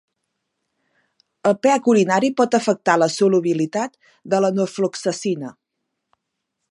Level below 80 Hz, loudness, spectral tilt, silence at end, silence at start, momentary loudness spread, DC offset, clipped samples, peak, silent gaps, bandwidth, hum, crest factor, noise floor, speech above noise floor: -74 dBFS; -19 LUFS; -5 dB/octave; 1.2 s; 1.45 s; 9 LU; under 0.1%; under 0.1%; 0 dBFS; none; 11.5 kHz; none; 20 dB; -78 dBFS; 59 dB